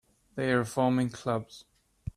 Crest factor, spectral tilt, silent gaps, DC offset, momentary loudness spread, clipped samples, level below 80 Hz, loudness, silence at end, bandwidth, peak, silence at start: 18 dB; -6.5 dB/octave; none; under 0.1%; 17 LU; under 0.1%; -56 dBFS; -29 LUFS; 0.05 s; 14 kHz; -12 dBFS; 0.35 s